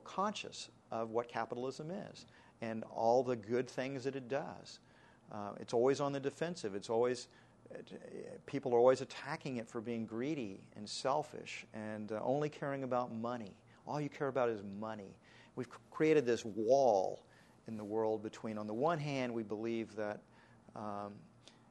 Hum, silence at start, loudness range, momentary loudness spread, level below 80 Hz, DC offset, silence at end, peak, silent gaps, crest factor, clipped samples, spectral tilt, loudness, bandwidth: none; 0 s; 5 LU; 18 LU; -78 dBFS; under 0.1%; 0.45 s; -16 dBFS; none; 22 dB; under 0.1%; -5.5 dB/octave; -38 LUFS; 11 kHz